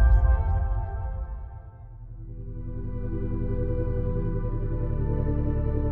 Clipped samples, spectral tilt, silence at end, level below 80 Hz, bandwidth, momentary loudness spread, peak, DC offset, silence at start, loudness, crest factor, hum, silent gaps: under 0.1%; -11 dB/octave; 0 s; -28 dBFS; 2.5 kHz; 17 LU; -10 dBFS; under 0.1%; 0 s; -29 LUFS; 16 dB; none; none